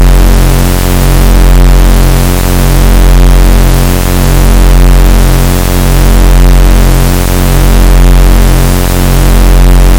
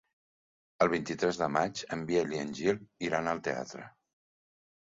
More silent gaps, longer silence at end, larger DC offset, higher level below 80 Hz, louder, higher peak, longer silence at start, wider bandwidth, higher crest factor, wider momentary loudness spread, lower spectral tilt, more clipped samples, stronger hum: neither; second, 0 s vs 1.05 s; neither; first, -4 dBFS vs -66 dBFS; first, -7 LUFS vs -32 LUFS; first, 0 dBFS vs -12 dBFS; second, 0 s vs 0.8 s; first, 17.5 kHz vs 7.8 kHz; second, 2 dB vs 22 dB; second, 2 LU vs 8 LU; about the same, -5.5 dB/octave vs -5 dB/octave; first, 5% vs under 0.1%; neither